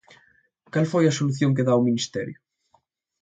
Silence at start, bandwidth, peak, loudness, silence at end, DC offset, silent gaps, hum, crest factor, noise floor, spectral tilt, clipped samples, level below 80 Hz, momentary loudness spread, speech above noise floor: 0.75 s; 9.2 kHz; -8 dBFS; -23 LUFS; 0.9 s; under 0.1%; none; none; 16 dB; -66 dBFS; -6 dB/octave; under 0.1%; -64 dBFS; 10 LU; 45 dB